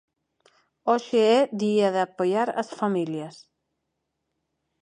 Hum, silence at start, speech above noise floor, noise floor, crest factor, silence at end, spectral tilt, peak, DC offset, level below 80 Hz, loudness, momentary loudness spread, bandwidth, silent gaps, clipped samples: none; 0.85 s; 56 dB; -80 dBFS; 18 dB; 1.5 s; -5.5 dB/octave; -8 dBFS; under 0.1%; -78 dBFS; -24 LUFS; 11 LU; 10.5 kHz; none; under 0.1%